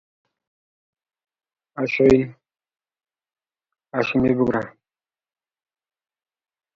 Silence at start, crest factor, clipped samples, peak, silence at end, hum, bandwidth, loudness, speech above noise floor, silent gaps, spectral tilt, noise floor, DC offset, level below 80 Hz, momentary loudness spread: 1.75 s; 22 dB; under 0.1%; -4 dBFS; 2.05 s; none; 7.4 kHz; -20 LUFS; over 71 dB; none; -7.5 dB/octave; under -90 dBFS; under 0.1%; -52 dBFS; 16 LU